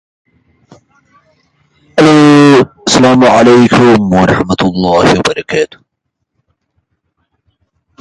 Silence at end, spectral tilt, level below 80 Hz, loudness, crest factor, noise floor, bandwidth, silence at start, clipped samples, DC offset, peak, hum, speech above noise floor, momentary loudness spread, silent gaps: 2.35 s; -5.5 dB/octave; -40 dBFS; -7 LUFS; 10 dB; -70 dBFS; 11.5 kHz; 1.95 s; 0.1%; under 0.1%; 0 dBFS; none; 63 dB; 10 LU; none